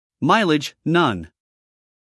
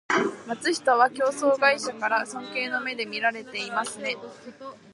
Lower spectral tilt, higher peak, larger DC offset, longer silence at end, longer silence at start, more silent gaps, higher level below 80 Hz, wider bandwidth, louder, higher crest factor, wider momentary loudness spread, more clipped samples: first, -5.5 dB/octave vs -2.5 dB/octave; first, -2 dBFS vs -6 dBFS; neither; first, 0.85 s vs 0 s; about the same, 0.2 s vs 0.1 s; neither; first, -60 dBFS vs -76 dBFS; about the same, 12 kHz vs 11.5 kHz; first, -19 LUFS vs -25 LUFS; about the same, 18 dB vs 20 dB; second, 5 LU vs 13 LU; neither